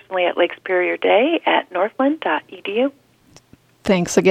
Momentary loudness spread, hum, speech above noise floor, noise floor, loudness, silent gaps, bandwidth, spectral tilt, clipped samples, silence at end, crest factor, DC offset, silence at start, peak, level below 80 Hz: 8 LU; none; 34 dB; -52 dBFS; -19 LUFS; none; 15 kHz; -4.5 dB/octave; under 0.1%; 0 s; 20 dB; under 0.1%; 0.1 s; 0 dBFS; -58 dBFS